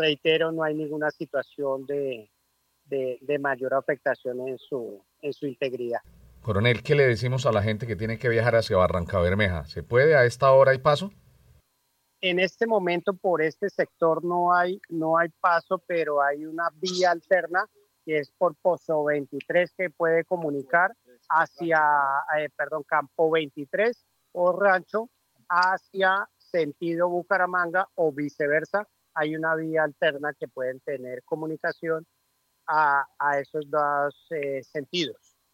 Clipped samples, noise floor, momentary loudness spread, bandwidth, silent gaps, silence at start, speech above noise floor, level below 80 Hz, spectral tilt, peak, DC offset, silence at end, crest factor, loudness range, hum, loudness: under 0.1%; -72 dBFS; 11 LU; 16 kHz; none; 0 s; 47 dB; -60 dBFS; -6 dB/octave; -6 dBFS; under 0.1%; 0.4 s; 20 dB; 7 LU; none; -25 LUFS